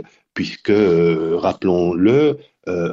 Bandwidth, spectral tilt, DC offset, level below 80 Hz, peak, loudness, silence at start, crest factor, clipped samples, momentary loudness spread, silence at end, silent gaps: 7.2 kHz; -7.5 dB/octave; under 0.1%; -52 dBFS; -4 dBFS; -17 LUFS; 0 s; 14 dB; under 0.1%; 12 LU; 0 s; none